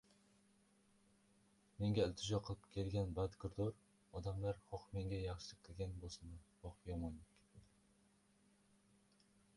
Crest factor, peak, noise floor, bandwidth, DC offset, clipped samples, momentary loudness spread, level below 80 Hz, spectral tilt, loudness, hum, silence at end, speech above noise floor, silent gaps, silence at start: 22 dB; -26 dBFS; -75 dBFS; 11.5 kHz; under 0.1%; under 0.1%; 15 LU; -60 dBFS; -6.5 dB/octave; -45 LUFS; none; 1.95 s; 31 dB; none; 1.8 s